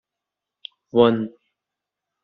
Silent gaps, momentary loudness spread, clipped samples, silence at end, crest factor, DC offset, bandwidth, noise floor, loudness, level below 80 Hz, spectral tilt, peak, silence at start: none; 24 LU; under 0.1%; 0.95 s; 22 dB; under 0.1%; 4.6 kHz; -85 dBFS; -19 LUFS; -62 dBFS; -5 dB/octave; -2 dBFS; 0.95 s